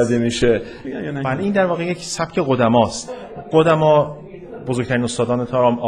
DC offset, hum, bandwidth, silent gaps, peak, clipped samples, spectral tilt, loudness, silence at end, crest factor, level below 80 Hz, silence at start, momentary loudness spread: under 0.1%; none; 11.5 kHz; none; -2 dBFS; under 0.1%; -5.5 dB/octave; -18 LUFS; 0 s; 16 dB; -46 dBFS; 0 s; 14 LU